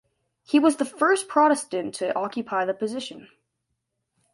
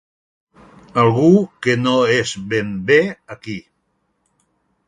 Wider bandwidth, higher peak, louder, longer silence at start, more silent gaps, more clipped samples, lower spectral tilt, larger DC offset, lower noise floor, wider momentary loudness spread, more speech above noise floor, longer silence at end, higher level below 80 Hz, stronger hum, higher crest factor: about the same, 11.5 kHz vs 11.5 kHz; second, -6 dBFS vs -2 dBFS; second, -24 LUFS vs -16 LUFS; second, 0.5 s vs 0.95 s; neither; neither; second, -3.5 dB/octave vs -6 dB/octave; neither; first, -79 dBFS vs -68 dBFS; second, 10 LU vs 17 LU; about the same, 55 dB vs 52 dB; second, 1.1 s vs 1.3 s; second, -74 dBFS vs -56 dBFS; neither; about the same, 18 dB vs 18 dB